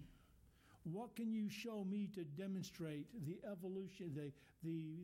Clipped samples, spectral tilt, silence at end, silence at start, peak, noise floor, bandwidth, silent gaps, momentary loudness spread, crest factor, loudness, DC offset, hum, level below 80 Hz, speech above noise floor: under 0.1%; -6.5 dB/octave; 0 s; 0 s; -38 dBFS; -70 dBFS; 16.5 kHz; none; 6 LU; 10 dB; -48 LUFS; under 0.1%; none; -76 dBFS; 23 dB